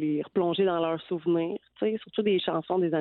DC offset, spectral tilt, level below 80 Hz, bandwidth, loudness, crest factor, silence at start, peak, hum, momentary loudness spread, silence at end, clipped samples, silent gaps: under 0.1%; -10.5 dB/octave; -72 dBFS; 4.3 kHz; -28 LUFS; 14 dB; 0 s; -14 dBFS; none; 5 LU; 0 s; under 0.1%; none